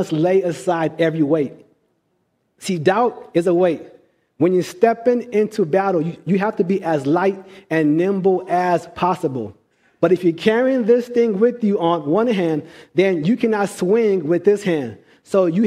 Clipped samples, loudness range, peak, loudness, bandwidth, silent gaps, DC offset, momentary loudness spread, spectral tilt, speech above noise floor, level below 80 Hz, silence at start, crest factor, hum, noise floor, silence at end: under 0.1%; 3 LU; 0 dBFS; -18 LUFS; 14 kHz; none; under 0.1%; 6 LU; -7 dB/octave; 50 dB; -64 dBFS; 0 s; 18 dB; none; -67 dBFS; 0 s